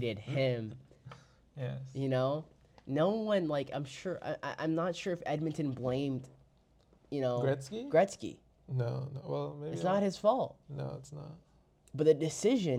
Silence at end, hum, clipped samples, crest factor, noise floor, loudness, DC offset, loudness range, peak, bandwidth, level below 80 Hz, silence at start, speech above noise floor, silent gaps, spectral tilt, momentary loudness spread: 0 s; none; under 0.1%; 20 dB; -67 dBFS; -34 LUFS; under 0.1%; 3 LU; -14 dBFS; 12.5 kHz; -68 dBFS; 0 s; 33 dB; none; -6.5 dB/octave; 16 LU